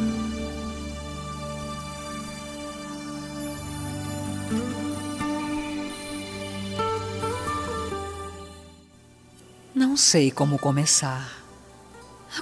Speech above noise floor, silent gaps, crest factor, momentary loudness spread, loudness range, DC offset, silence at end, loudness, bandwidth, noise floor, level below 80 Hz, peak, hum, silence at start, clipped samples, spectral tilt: 30 dB; none; 22 dB; 16 LU; 11 LU; under 0.1%; 0 s; -27 LUFS; 11 kHz; -52 dBFS; -46 dBFS; -6 dBFS; none; 0 s; under 0.1%; -3.5 dB/octave